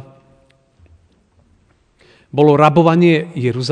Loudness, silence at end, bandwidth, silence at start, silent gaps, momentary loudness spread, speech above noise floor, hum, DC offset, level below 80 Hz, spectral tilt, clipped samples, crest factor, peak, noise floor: -13 LUFS; 0 s; 9.8 kHz; 2.35 s; none; 10 LU; 43 dB; none; under 0.1%; -54 dBFS; -7.5 dB/octave; 0.1%; 16 dB; 0 dBFS; -56 dBFS